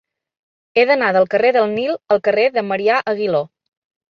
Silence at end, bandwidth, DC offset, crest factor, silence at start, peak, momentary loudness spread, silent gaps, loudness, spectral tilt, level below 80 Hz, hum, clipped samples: 0.7 s; 6.6 kHz; under 0.1%; 16 dB; 0.75 s; -2 dBFS; 7 LU; none; -16 LUFS; -6.5 dB/octave; -66 dBFS; none; under 0.1%